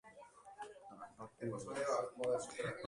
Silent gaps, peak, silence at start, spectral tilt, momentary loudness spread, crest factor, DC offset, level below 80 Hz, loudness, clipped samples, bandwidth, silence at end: none; -26 dBFS; 0.05 s; -4.5 dB/octave; 18 LU; 18 dB; under 0.1%; -78 dBFS; -41 LUFS; under 0.1%; 11.5 kHz; 0 s